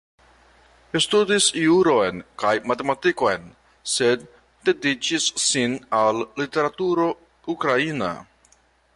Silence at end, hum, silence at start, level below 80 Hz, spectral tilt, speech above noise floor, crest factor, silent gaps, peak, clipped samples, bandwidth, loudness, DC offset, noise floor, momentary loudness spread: 0.75 s; none; 0.95 s; -60 dBFS; -3 dB/octave; 38 dB; 16 dB; none; -6 dBFS; under 0.1%; 11.5 kHz; -21 LUFS; under 0.1%; -59 dBFS; 10 LU